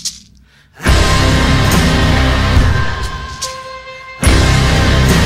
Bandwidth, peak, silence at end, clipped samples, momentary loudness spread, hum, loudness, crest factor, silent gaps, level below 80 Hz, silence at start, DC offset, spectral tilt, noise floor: 15.5 kHz; 0 dBFS; 0 s; under 0.1%; 12 LU; none; -13 LUFS; 12 dB; none; -16 dBFS; 0 s; under 0.1%; -4.5 dB/octave; -45 dBFS